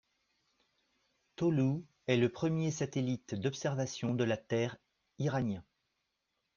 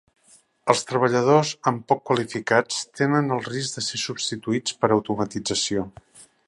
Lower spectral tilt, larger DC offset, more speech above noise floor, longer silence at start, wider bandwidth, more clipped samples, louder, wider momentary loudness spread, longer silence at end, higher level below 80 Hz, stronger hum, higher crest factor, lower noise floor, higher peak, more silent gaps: first, -6.5 dB/octave vs -4 dB/octave; neither; first, 50 dB vs 35 dB; first, 1.4 s vs 0.65 s; second, 7.4 kHz vs 11.5 kHz; neither; second, -34 LUFS vs -23 LUFS; about the same, 7 LU vs 8 LU; first, 0.95 s vs 0.25 s; second, -70 dBFS vs -60 dBFS; neither; about the same, 22 dB vs 22 dB; first, -84 dBFS vs -57 dBFS; second, -14 dBFS vs 0 dBFS; neither